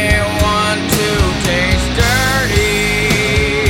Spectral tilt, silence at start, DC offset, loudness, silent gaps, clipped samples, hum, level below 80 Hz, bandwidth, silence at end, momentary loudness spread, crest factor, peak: -4 dB/octave; 0 s; under 0.1%; -13 LUFS; none; under 0.1%; none; -22 dBFS; 17 kHz; 0 s; 2 LU; 14 dB; 0 dBFS